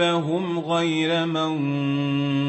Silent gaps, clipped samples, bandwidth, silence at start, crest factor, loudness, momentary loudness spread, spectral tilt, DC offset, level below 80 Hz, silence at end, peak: none; under 0.1%; 8.4 kHz; 0 s; 12 dB; -23 LUFS; 3 LU; -6 dB/octave; under 0.1%; -68 dBFS; 0 s; -10 dBFS